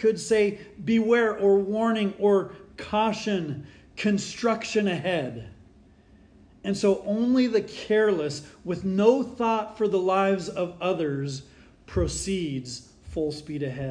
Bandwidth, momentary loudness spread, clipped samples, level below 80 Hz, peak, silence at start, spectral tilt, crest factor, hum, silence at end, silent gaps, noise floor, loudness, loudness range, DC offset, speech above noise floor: 10.5 kHz; 13 LU; under 0.1%; -50 dBFS; -6 dBFS; 0 s; -5.5 dB/octave; 20 dB; none; 0 s; none; -55 dBFS; -25 LUFS; 5 LU; under 0.1%; 30 dB